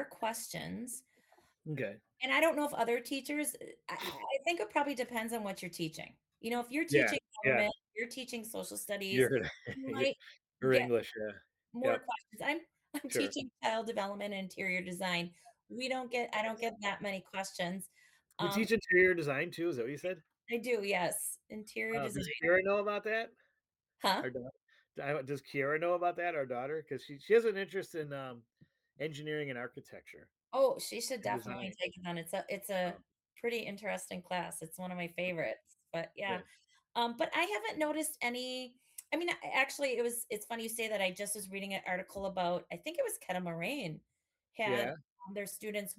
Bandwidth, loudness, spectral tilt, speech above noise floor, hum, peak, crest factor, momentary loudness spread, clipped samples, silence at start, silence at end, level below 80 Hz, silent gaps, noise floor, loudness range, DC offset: 18 kHz; -36 LUFS; -4 dB/octave; 50 dB; none; -16 dBFS; 22 dB; 14 LU; under 0.1%; 0 s; 0.05 s; -74 dBFS; 24.62-24.67 s, 45.10-45.16 s; -86 dBFS; 5 LU; under 0.1%